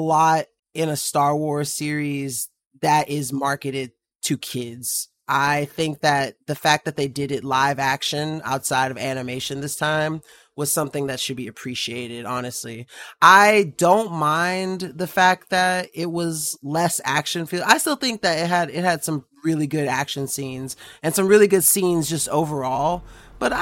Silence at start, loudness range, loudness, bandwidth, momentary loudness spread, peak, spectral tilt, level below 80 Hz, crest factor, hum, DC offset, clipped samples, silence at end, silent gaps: 0 s; 6 LU; -21 LUFS; 16.5 kHz; 11 LU; 0 dBFS; -3.5 dB/octave; -56 dBFS; 22 dB; none; under 0.1%; under 0.1%; 0 s; 0.59-0.63 s, 4.15-4.19 s